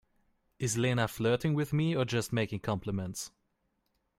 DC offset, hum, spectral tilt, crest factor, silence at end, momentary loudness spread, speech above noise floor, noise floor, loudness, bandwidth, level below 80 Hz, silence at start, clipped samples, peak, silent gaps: under 0.1%; none; -5.5 dB/octave; 20 dB; 0.9 s; 8 LU; 47 dB; -78 dBFS; -32 LUFS; 16 kHz; -60 dBFS; 0.6 s; under 0.1%; -14 dBFS; none